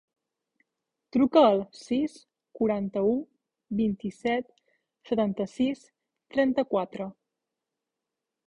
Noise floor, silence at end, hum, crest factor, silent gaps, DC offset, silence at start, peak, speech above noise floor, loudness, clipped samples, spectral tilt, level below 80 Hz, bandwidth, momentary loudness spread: -87 dBFS; 1.4 s; none; 22 dB; none; under 0.1%; 1.15 s; -8 dBFS; 61 dB; -27 LUFS; under 0.1%; -7 dB/octave; -64 dBFS; 10.5 kHz; 12 LU